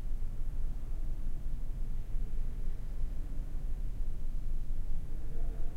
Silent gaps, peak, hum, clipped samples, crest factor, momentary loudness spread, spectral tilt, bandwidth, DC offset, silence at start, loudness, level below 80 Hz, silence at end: none; -20 dBFS; none; under 0.1%; 10 dB; 1 LU; -7.5 dB/octave; 2 kHz; under 0.1%; 0 s; -43 LUFS; -32 dBFS; 0 s